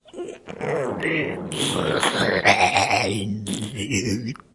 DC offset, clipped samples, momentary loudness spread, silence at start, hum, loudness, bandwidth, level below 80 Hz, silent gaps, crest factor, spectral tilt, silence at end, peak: under 0.1%; under 0.1%; 11 LU; 0.15 s; none; -22 LUFS; 11.5 kHz; -56 dBFS; none; 20 dB; -3.5 dB/octave; 0.15 s; -2 dBFS